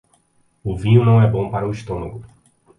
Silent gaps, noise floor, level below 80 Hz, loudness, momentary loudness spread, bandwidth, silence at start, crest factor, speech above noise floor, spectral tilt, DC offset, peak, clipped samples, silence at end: none; -61 dBFS; -42 dBFS; -18 LUFS; 18 LU; 9.4 kHz; 0.65 s; 18 dB; 44 dB; -9 dB/octave; under 0.1%; 0 dBFS; under 0.1%; 0.5 s